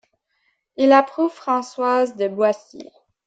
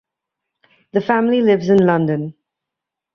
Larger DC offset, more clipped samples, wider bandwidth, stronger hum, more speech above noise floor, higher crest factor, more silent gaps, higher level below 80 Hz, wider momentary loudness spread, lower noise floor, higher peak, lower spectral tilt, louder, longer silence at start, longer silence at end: neither; neither; first, 8 kHz vs 6.6 kHz; neither; second, 50 dB vs 69 dB; about the same, 20 dB vs 16 dB; neither; second, -72 dBFS vs -58 dBFS; about the same, 8 LU vs 10 LU; second, -69 dBFS vs -84 dBFS; about the same, -2 dBFS vs -2 dBFS; second, -5 dB/octave vs -8 dB/octave; second, -19 LUFS vs -16 LUFS; second, 0.8 s vs 0.95 s; second, 0.45 s vs 0.85 s